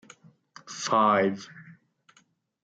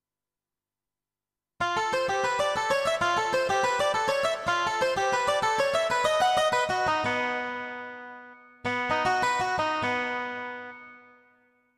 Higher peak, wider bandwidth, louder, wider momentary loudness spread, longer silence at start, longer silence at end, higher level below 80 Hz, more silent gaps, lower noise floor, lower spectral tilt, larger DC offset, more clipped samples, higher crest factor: about the same, -10 dBFS vs -10 dBFS; second, 9 kHz vs 15.5 kHz; about the same, -24 LUFS vs -26 LUFS; first, 20 LU vs 12 LU; second, 0.65 s vs 1.6 s; first, 0.95 s vs 0.8 s; second, -80 dBFS vs -60 dBFS; neither; second, -66 dBFS vs under -90 dBFS; first, -4.5 dB/octave vs -2.5 dB/octave; neither; neither; about the same, 20 dB vs 18 dB